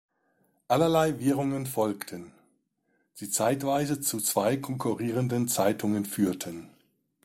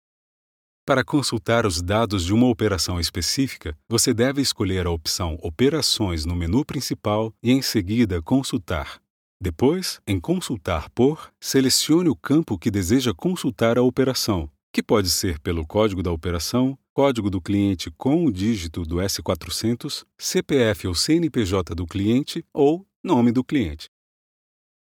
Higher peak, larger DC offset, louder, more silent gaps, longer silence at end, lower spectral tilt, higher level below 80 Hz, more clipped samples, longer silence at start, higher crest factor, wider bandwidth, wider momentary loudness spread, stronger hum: second, -10 dBFS vs -4 dBFS; neither; second, -27 LUFS vs -22 LUFS; second, none vs 9.10-9.40 s, 14.63-14.74 s, 16.90-16.96 s, 22.96-23.04 s; second, 0.55 s vs 1 s; about the same, -5 dB/octave vs -5 dB/octave; second, -64 dBFS vs -42 dBFS; neither; second, 0.7 s vs 0.85 s; about the same, 18 dB vs 18 dB; about the same, 16.5 kHz vs 17.5 kHz; first, 12 LU vs 8 LU; neither